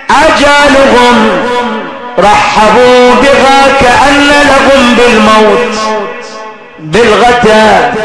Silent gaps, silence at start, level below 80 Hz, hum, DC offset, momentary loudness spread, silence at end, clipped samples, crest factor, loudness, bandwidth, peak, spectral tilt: none; 0 s; -28 dBFS; none; under 0.1%; 10 LU; 0 s; 10%; 4 dB; -4 LUFS; 11 kHz; 0 dBFS; -3.5 dB/octave